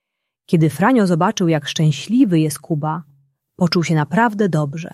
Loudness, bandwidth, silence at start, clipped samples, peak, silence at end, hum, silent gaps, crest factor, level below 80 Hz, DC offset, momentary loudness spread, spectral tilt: -17 LUFS; 14 kHz; 0.5 s; under 0.1%; -2 dBFS; 0.05 s; none; none; 16 dB; -60 dBFS; under 0.1%; 7 LU; -6 dB/octave